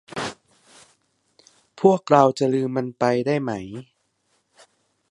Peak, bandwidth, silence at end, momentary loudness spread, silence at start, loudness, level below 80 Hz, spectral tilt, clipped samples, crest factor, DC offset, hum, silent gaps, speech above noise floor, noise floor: 0 dBFS; 11.5 kHz; 1.3 s; 16 LU; 0.1 s; -21 LUFS; -64 dBFS; -6.5 dB/octave; under 0.1%; 24 dB; under 0.1%; none; none; 49 dB; -69 dBFS